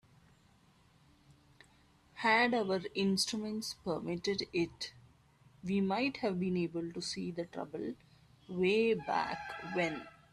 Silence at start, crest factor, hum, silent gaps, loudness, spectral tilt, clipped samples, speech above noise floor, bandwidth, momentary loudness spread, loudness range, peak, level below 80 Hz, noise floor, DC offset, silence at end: 2.15 s; 20 dB; none; none; -35 LUFS; -4.5 dB/octave; under 0.1%; 32 dB; 13.5 kHz; 13 LU; 4 LU; -16 dBFS; -70 dBFS; -66 dBFS; under 0.1%; 0.2 s